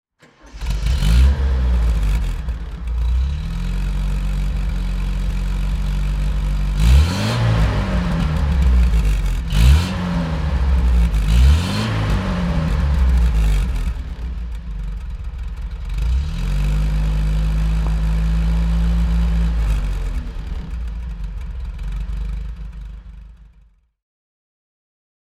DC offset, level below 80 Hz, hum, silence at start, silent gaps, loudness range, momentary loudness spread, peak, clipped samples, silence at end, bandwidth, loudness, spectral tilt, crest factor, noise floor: under 0.1%; -18 dBFS; none; 0.45 s; none; 12 LU; 14 LU; -2 dBFS; under 0.1%; 1.95 s; 12 kHz; -20 LUFS; -6.5 dB/octave; 16 dB; -52 dBFS